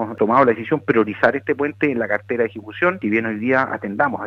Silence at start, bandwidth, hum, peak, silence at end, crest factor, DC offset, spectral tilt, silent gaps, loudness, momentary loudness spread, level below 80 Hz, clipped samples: 0 s; 6.6 kHz; none; 0 dBFS; 0 s; 18 dB; under 0.1%; -8.5 dB/octave; none; -19 LUFS; 7 LU; -60 dBFS; under 0.1%